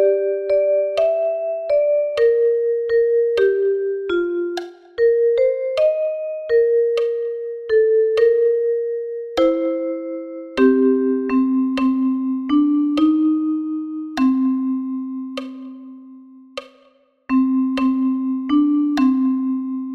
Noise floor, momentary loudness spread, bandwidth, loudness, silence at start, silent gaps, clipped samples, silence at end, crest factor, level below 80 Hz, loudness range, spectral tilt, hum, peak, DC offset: -56 dBFS; 11 LU; 6.8 kHz; -19 LUFS; 0 s; none; under 0.1%; 0 s; 14 dB; -58 dBFS; 5 LU; -6 dB/octave; none; -4 dBFS; under 0.1%